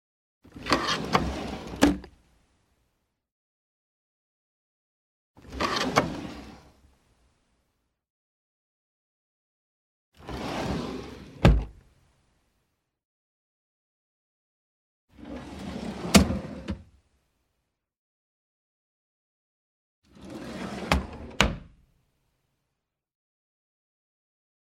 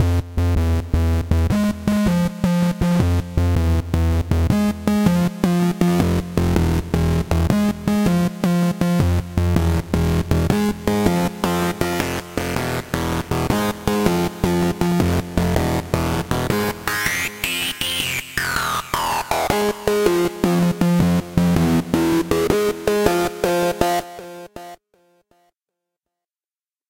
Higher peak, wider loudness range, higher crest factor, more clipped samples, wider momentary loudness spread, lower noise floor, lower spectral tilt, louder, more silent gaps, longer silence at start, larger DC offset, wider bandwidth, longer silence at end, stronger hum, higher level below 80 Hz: about the same, -2 dBFS vs 0 dBFS; first, 16 LU vs 3 LU; first, 32 dB vs 18 dB; neither; first, 20 LU vs 4 LU; second, -83 dBFS vs under -90 dBFS; second, -4.5 dB/octave vs -6 dB/octave; second, -27 LUFS vs -20 LUFS; first, 3.32-5.34 s, 8.10-10.12 s, 13.05-15.08 s, 17.99-20.02 s vs none; first, 0.55 s vs 0 s; neither; about the same, 16.5 kHz vs 17 kHz; first, 3.1 s vs 2.15 s; neither; second, -40 dBFS vs -30 dBFS